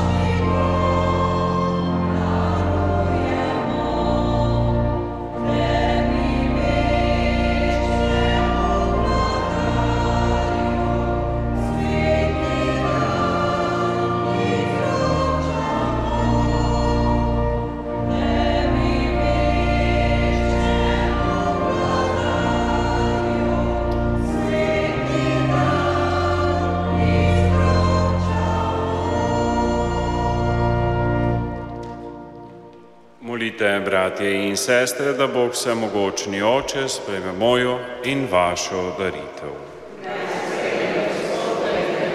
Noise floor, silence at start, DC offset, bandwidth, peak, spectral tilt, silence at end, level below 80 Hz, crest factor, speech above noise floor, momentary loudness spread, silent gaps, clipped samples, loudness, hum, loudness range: -46 dBFS; 0 s; under 0.1%; 14 kHz; -4 dBFS; -6 dB/octave; 0 s; -28 dBFS; 16 dB; 25 dB; 5 LU; none; under 0.1%; -20 LUFS; none; 3 LU